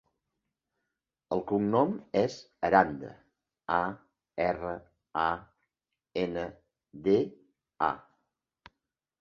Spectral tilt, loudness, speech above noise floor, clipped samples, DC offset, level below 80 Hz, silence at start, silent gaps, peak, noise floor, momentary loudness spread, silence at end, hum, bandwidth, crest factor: -7 dB/octave; -30 LUFS; 57 dB; under 0.1%; under 0.1%; -62 dBFS; 1.3 s; none; -6 dBFS; -86 dBFS; 16 LU; 1.2 s; none; 7.4 kHz; 26 dB